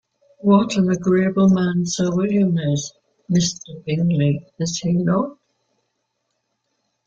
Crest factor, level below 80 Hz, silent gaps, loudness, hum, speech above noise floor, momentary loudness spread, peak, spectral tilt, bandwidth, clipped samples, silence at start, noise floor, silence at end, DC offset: 18 dB; -56 dBFS; none; -19 LUFS; none; 55 dB; 9 LU; -2 dBFS; -6 dB/octave; 7.8 kHz; under 0.1%; 0.45 s; -74 dBFS; 1.75 s; under 0.1%